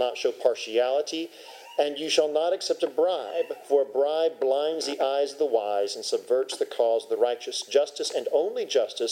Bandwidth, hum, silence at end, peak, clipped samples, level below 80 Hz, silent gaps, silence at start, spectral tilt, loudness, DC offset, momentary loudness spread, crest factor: 16 kHz; none; 0 s; -8 dBFS; under 0.1%; under -90 dBFS; none; 0 s; -1.5 dB/octave; -26 LUFS; under 0.1%; 5 LU; 18 dB